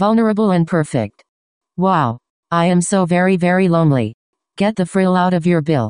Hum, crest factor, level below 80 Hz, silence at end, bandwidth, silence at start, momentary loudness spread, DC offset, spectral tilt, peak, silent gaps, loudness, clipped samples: none; 14 dB; -54 dBFS; 0 s; 10.5 kHz; 0 s; 8 LU; under 0.1%; -6.5 dB/octave; -2 dBFS; 1.29-1.61 s, 2.30-2.43 s, 4.14-4.33 s; -16 LUFS; under 0.1%